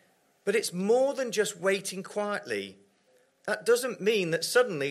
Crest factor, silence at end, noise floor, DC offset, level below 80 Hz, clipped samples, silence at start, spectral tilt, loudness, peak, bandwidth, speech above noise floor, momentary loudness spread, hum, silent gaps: 18 dB; 0 s; -66 dBFS; under 0.1%; -82 dBFS; under 0.1%; 0.45 s; -3.5 dB/octave; -28 LUFS; -12 dBFS; 14.5 kHz; 38 dB; 10 LU; none; none